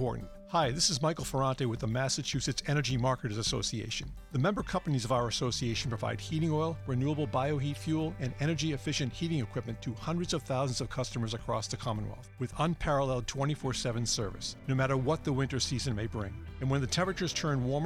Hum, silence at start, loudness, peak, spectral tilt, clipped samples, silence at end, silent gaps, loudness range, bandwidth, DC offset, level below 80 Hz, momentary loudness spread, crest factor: none; 0 s; -32 LUFS; -14 dBFS; -4.5 dB/octave; under 0.1%; 0 s; none; 3 LU; 14 kHz; under 0.1%; -48 dBFS; 7 LU; 18 dB